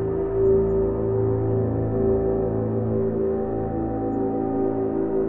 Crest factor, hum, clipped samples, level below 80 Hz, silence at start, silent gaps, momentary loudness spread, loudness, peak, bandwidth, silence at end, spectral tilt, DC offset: 12 dB; none; under 0.1%; -38 dBFS; 0 s; none; 5 LU; -23 LUFS; -10 dBFS; 2.6 kHz; 0 s; -13.5 dB/octave; under 0.1%